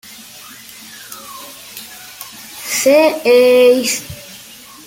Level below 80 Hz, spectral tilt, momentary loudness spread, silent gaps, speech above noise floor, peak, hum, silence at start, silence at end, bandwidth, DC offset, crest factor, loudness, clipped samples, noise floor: -56 dBFS; -2 dB/octave; 24 LU; none; 27 dB; -2 dBFS; none; 0.9 s; 0.5 s; 17 kHz; under 0.1%; 16 dB; -12 LUFS; under 0.1%; -38 dBFS